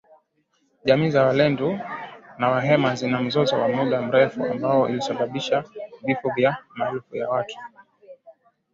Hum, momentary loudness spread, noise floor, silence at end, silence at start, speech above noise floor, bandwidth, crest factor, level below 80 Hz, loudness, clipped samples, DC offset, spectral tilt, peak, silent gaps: none; 12 LU; -68 dBFS; 0.45 s; 0.85 s; 47 dB; 7.6 kHz; 20 dB; -62 dBFS; -22 LUFS; under 0.1%; under 0.1%; -6.5 dB/octave; -4 dBFS; none